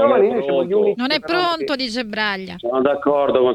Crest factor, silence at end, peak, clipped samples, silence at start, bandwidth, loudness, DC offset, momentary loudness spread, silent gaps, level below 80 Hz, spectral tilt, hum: 16 dB; 0 s; -2 dBFS; under 0.1%; 0 s; 11.5 kHz; -19 LUFS; under 0.1%; 6 LU; none; -56 dBFS; -5 dB/octave; none